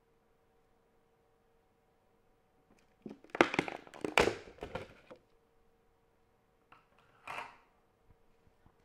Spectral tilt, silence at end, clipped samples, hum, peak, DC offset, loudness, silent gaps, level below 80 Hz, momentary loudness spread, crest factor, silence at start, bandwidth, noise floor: -4 dB/octave; 1.35 s; under 0.1%; none; -6 dBFS; under 0.1%; -35 LUFS; none; -64 dBFS; 23 LU; 36 dB; 3.05 s; 15.5 kHz; -72 dBFS